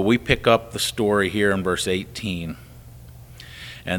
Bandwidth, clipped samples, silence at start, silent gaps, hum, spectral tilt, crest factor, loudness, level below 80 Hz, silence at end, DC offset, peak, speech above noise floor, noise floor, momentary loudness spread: 19 kHz; under 0.1%; 0 s; none; none; -4.5 dB/octave; 22 dB; -21 LUFS; -44 dBFS; 0 s; under 0.1%; -2 dBFS; 21 dB; -43 dBFS; 19 LU